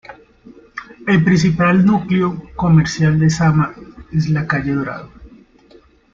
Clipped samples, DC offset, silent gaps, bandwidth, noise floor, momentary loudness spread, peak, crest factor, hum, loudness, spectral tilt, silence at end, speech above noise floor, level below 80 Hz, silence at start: under 0.1%; under 0.1%; none; 7.6 kHz; -48 dBFS; 14 LU; -2 dBFS; 14 dB; none; -16 LUFS; -7 dB/octave; 0.85 s; 34 dB; -42 dBFS; 0.1 s